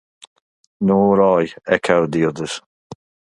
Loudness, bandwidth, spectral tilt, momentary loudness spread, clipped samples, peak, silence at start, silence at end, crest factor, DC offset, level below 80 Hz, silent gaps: -17 LUFS; 11.5 kHz; -6.5 dB/octave; 13 LU; under 0.1%; 0 dBFS; 0.8 s; 0.4 s; 18 dB; under 0.1%; -54 dBFS; 2.66-2.90 s